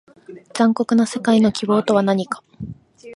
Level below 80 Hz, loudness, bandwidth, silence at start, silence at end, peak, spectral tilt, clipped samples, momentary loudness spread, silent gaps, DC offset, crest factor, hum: -54 dBFS; -18 LUFS; 11.5 kHz; 0.3 s; 0 s; -2 dBFS; -6 dB/octave; under 0.1%; 18 LU; none; under 0.1%; 16 dB; none